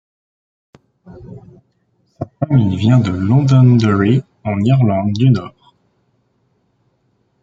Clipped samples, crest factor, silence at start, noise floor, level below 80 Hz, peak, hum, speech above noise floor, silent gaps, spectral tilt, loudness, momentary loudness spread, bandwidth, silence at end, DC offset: under 0.1%; 14 dB; 1.1 s; -62 dBFS; -50 dBFS; -2 dBFS; none; 49 dB; none; -8.5 dB/octave; -14 LUFS; 20 LU; 7.4 kHz; 1.95 s; under 0.1%